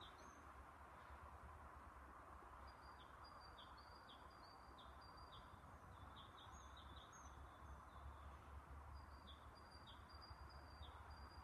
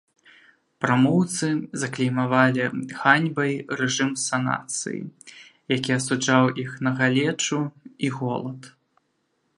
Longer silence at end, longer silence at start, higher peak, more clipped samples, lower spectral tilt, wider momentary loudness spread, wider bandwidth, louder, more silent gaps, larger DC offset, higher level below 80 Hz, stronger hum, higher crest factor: second, 0 s vs 0.85 s; second, 0 s vs 0.8 s; second, -46 dBFS vs -2 dBFS; neither; about the same, -4.5 dB/octave vs -4.5 dB/octave; second, 2 LU vs 10 LU; first, 13 kHz vs 11.5 kHz; second, -61 LUFS vs -23 LUFS; neither; neither; about the same, -66 dBFS vs -68 dBFS; neither; second, 16 dB vs 22 dB